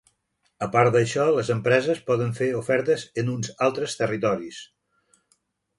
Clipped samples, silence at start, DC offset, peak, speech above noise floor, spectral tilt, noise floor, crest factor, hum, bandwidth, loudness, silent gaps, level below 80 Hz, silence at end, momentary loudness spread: under 0.1%; 0.6 s; under 0.1%; -6 dBFS; 49 dB; -5.5 dB/octave; -72 dBFS; 20 dB; none; 11.5 kHz; -23 LUFS; none; -62 dBFS; 1.15 s; 8 LU